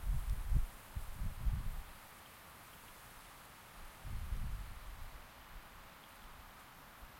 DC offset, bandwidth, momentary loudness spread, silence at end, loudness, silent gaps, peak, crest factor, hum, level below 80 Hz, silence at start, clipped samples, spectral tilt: under 0.1%; 16.5 kHz; 14 LU; 0 s; -48 LUFS; none; -22 dBFS; 20 dB; none; -44 dBFS; 0 s; under 0.1%; -5 dB/octave